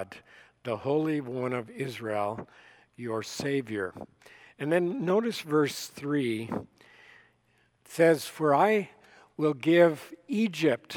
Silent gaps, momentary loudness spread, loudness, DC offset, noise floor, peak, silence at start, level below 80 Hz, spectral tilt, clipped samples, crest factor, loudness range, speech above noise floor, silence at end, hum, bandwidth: none; 18 LU; -28 LUFS; under 0.1%; -68 dBFS; -8 dBFS; 0 s; -74 dBFS; -5.5 dB/octave; under 0.1%; 20 dB; 7 LU; 40 dB; 0 s; none; 18.5 kHz